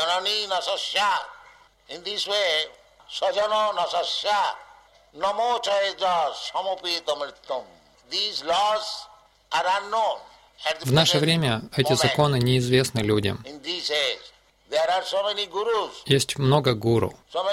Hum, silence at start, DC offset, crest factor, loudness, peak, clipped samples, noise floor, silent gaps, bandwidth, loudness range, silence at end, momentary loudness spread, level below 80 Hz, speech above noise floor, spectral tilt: none; 0 s; under 0.1%; 20 dB; -24 LUFS; -4 dBFS; under 0.1%; -53 dBFS; none; 16 kHz; 5 LU; 0 s; 10 LU; -56 dBFS; 29 dB; -4.5 dB/octave